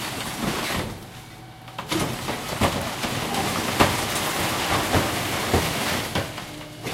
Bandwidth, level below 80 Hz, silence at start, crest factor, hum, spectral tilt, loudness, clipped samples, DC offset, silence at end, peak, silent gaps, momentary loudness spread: 16 kHz; -42 dBFS; 0 s; 22 dB; none; -3.5 dB/octave; -24 LUFS; under 0.1%; under 0.1%; 0 s; -2 dBFS; none; 15 LU